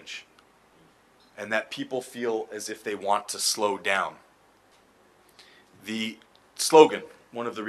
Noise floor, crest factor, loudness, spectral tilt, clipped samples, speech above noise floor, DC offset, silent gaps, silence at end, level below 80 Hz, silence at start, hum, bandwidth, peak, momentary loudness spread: -60 dBFS; 26 dB; -25 LUFS; -2.5 dB/octave; under 0.1%; 35 dB; under 0.1%; none; 0 s; -78 dBFS; 0.05 s; none; 13 kHz; -2 dBFS; 22 LU